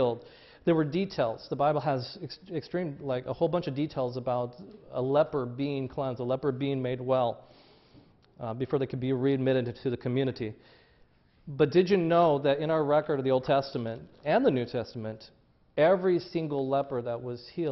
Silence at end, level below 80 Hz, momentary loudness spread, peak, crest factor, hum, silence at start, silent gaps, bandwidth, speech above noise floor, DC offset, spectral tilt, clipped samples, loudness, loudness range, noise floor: 0 s; -64 dBFS; 14 LU; -10 dBFS; 18 dB; none; 0 s; none; 6 kHz; 34 dB; under 0.1%; -8.5 dB/octave; under 0.1%; -29 LUFS; 5 LU; -62 dBFS